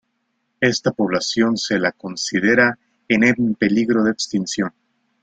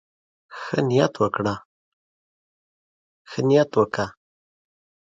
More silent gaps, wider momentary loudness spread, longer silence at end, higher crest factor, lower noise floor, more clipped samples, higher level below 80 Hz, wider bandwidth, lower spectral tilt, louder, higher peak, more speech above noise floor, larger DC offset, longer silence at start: second, none vs 1.65-3.25 s; second, 8 LU vs 16 LU; second, 0.55 s vs 1 s; about the same, 18 dB vs 22 dB; second, -71 dBFS vs under -90 dBFS; neither; about the same, -58 dBFS vs -60 dBFS; first, 9.2 kHz vs 7.8 kHz; second, -4.5 dB/octave vs -6.5 dB/octave; first, -19 LUFS vs -22 LUFS; about the same, -2 dBFS vs -2 dBFS; second, 53 dB vs over 69 dB; neither; about the same, 0.6 s vs 0.5 s